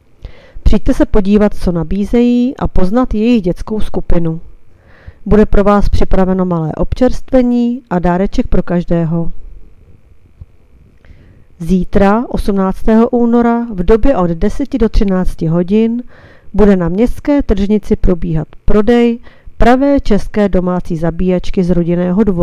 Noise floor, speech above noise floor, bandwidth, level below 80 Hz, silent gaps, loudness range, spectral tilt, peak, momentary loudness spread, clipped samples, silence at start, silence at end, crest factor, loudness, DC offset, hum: -42 dBFS; 32 dB; 9.6 kHz; -20 dBFS; none; 5 LU; -8.5 dB/octave; 0 dBFS; 7 LU; 0.5%; 0.25 s; 0 s; 10 dB; -13 LUFS; under 0.1%; none